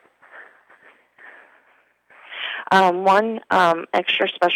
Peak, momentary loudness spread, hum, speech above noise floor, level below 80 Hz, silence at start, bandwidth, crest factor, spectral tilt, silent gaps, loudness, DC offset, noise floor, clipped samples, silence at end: -2 dBFS; 12 LU; 60 Hz at -55 dBFS; 42 dB; -72 dBFS; 0.35 s; 16.5 kHz; 18 dB; -4.5 dB/octave; none; -19 LUFS; under 0.1%; -60 dBFS; under 0.1%; 0 s